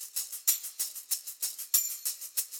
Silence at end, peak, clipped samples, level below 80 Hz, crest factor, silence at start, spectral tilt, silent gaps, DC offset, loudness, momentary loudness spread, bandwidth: 0 s; -12 dBFS; under 0.1%; -86 dBFS; 22 dB; 0 s; 5 dB/octave; none; under 0.1%; -30 LUFS; 8 LU; 18 kHz